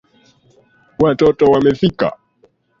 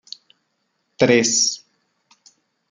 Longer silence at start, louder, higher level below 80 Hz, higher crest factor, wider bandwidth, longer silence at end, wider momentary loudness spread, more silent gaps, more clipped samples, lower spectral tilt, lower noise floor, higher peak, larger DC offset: about the same, 1 s vs 1 s; first, -14 LUFS vs -17 LUFS; first, -46 dBFS vs -64 dBFS; about the same, 16 dB vs 20 dB; second, 7.2 kHz vs 11 kHz; second, 0.7 s vs 1.15 s; second, 8 LU vs 24 LU; neither; neither; first, -7.5 dB/octave vs -2.5 dB/octave; second, -56 dBFS vs -71 dBFS; about the same, -2 dBFS vs -2 dBFS; neither